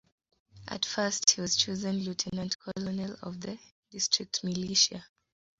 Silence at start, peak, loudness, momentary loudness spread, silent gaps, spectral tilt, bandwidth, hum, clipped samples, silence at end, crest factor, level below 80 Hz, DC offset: 0.55 s; -6 dBFS; -29 LUFS; 17 LU; 2.55-2.59 s, 3.71-3.83 s; -2.5 dB/octave; 8 kHz; none; under 0.1%; 0.55 s; 28 dB; -64 dBFS; under 0.1%